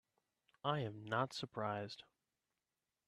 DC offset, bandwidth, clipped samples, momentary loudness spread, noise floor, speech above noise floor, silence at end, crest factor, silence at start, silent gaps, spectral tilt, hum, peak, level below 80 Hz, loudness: under 0.1%; 13 kHz; under 0.1%; 8 LU; under -90 dBFS; over 48 dB; 1.05 s; 22 dB; 0.65 s; none; -5.5 dB/octave; none; -22 dBFS; -82 dBFS; -42 LUFS